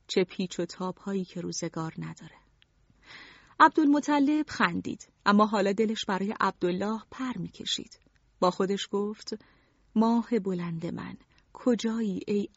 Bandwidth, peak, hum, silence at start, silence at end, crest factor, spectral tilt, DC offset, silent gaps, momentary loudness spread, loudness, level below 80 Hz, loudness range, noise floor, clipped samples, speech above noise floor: 8 kHz; -6 dBFS; none; 0.1 s; 0.1 s; 22 dB; -4 dB/octave; under 0.1%; none; 16 LU; -28 LUFS; -66 dBFS; 7 LU; -64 dBFS; under 0.1%; 36 dB